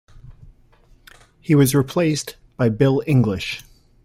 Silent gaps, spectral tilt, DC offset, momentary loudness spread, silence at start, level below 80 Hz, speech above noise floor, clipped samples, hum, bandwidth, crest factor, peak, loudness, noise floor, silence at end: none; -6 dB/octave; under 0.1%; 15 LU; 0.15 s; -48 dBFS; 35 dB; under 0.1%; none; 16 kHz; 18 dB; -2 dBFS; -19 LUFS; -52 dBFS; 0.45 s